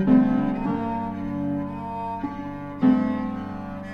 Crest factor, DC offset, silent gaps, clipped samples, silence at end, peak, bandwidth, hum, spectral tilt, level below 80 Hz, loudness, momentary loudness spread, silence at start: 18 dB; under 0.1%; none; under 0.1%; 0 s; -6 dBFS; 5.2 kHz; none; -9.5 dB/octave; -46 dBFS; -25 LUFS; 13 LU; 0 s